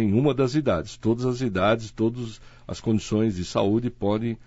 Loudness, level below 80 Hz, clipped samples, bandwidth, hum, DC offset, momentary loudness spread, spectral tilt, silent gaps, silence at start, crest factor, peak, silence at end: -24 LUFS; -48 dBFS; under 0.1%; 8 kHz; none; under 0.1%; 9 LU; -7 dB/octave; none; 0 s; 16 dB; -8 dBFS; 0.05 s